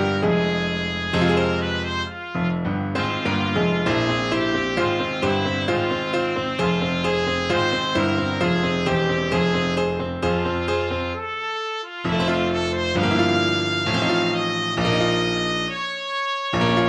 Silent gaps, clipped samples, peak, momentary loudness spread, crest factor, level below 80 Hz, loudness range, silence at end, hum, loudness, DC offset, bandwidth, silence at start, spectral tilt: none; under 0.1%; -4 dBFS; 5 LU; 18 dB; -46 dBFS; 2 LU; 0 s; none; -22 LUFS; under 0.1%; 9.8 kHz; 0 s; -5.5 dB/octave